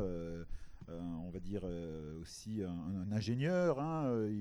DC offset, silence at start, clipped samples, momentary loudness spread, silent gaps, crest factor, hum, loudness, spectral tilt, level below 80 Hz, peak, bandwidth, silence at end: under 0.1%; 0 s; under 0.1%; 14 LU; none; 16 dB; none; -39 LUFS; -7.5 dB/octave; -54 dBFS; -22 dBFS; 12.5 kHz; 0 s